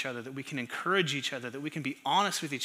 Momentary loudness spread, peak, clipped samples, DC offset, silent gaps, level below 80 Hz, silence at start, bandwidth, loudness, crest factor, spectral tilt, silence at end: 10 LU; -12 dBFS; under 0.1%; under 0.1%; none; -86 dBFS; 0 s; 15.5 kHz; -31 LUFS; 20 dB; -3.5 dB/octave; 0 s